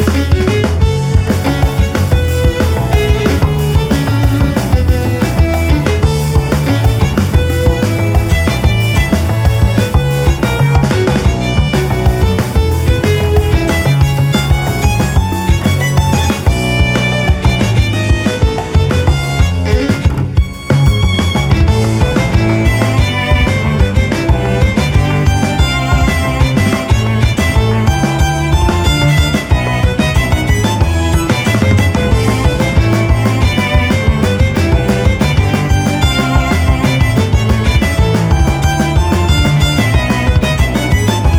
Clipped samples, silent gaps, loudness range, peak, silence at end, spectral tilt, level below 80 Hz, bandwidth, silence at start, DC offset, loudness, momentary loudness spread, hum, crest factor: under 0.1%; none; 1 LU; 0 dBFS; 0 s; -6 dB/octave; -16 dBFS; 16.5 kHz; 0 s; under 0.1%; -12 LUFS; 2 LU; none; 10 dB